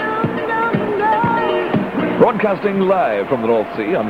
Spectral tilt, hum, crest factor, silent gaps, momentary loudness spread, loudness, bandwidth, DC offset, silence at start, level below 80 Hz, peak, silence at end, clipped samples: -8 dB/octave; none; 16 dB; none; 4 LU; -17 LUFS; 12 kHz; 0.1%; 0 s; -52 dBFS; 0 dBFS; 0 s; under 0.1%